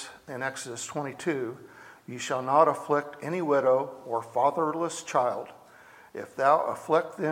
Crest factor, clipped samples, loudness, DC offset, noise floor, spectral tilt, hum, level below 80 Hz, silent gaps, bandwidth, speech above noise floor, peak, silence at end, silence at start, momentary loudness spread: 20 dB; under 0.1%; -28 LUFS; under 0.1%; -53 dBFS; -4.5 dB/octave; none; -78 dBFS; none; 16.5 kHz; 26 dB; -8 dBFS; 0 s; 0 s; 16 LU